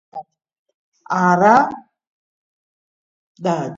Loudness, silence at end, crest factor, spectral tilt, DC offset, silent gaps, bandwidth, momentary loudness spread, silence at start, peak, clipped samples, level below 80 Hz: -16 LUFS; 0 s; 20 dB; -6.5 dB/octave; under 0.1%; 0.59-0.66 s, 0.74-0.92 s, 2.07-3.35 s; 7.8 kHz; 24 LU; 0.15 s; 0 dBFS; under 0.1%; -64 dBFS